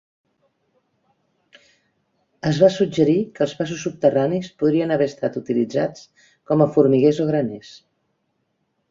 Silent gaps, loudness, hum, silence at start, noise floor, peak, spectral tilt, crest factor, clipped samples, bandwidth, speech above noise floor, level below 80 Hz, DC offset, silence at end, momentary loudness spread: none; -20 LUFS; none; 2.45 s; -71 dBFS; -2 dBFS; -7 dB/octave; 20 dB; under 0.1%; 7.6 kHz; 52 dB; -60 dBFS; under 0.1%; 1.15 s; 10 LU